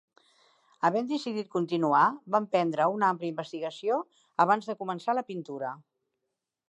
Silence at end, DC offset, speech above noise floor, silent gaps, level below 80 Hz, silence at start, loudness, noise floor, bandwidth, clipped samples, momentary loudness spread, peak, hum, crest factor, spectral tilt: 0.9 s; under 0.1%; 57 dB; none; -86 dBFS; 0.8 s; -29 LUFS; -85 dBFS; 9.4 kHz; under 0.1%; 12 LU; -8 dBFS; none; 22 dB; -6.5 dB/octave